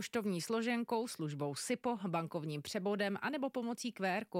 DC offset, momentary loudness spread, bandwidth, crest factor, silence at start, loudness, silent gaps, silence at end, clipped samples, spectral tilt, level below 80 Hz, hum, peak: under 0.1%; 5 LU; 16 kHz; 16 dB; 0 s; -38 LUFS; none; 0 s; under 0.1%; -5 dB/octave; -80 dBFS; none; -22 dBFS